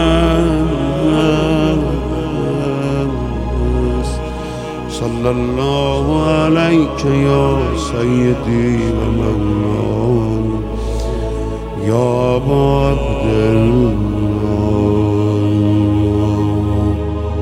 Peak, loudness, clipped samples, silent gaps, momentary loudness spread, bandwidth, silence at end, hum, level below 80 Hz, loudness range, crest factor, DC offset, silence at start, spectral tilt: 0 dBFS; -15 LUFS; under 0.1%; none; 8 LU; 12 kHz; 0 s; none; -24 dBFS; 4 LU; 14 dB; under 0.1%; 0 s; -7.5 dB/octave